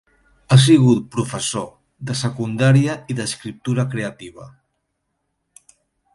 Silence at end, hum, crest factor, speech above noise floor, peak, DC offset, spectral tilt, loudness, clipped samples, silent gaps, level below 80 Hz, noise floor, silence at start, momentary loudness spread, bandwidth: 1.65 s; none; 18 dB; 56 dB; 0 dBFS; under 0.1%; -5.5 dB/octave; -18 LUFS; under 0.1%; none; -54 dBFS; -73 dBFS; 0.5 s; 17 LU; 11.5 kHz